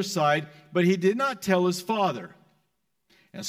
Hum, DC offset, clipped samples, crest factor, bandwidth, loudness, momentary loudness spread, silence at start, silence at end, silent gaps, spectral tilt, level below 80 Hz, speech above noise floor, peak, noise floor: none; under 0.1%; under 0.1%; 16 dB; 16 kHz; -25 LUFS; 13 LU; 0 s; 0 s; none; -5.5 dB/octave; -72 dBFS; 52 dB; -10 dBFS; -76 dBFS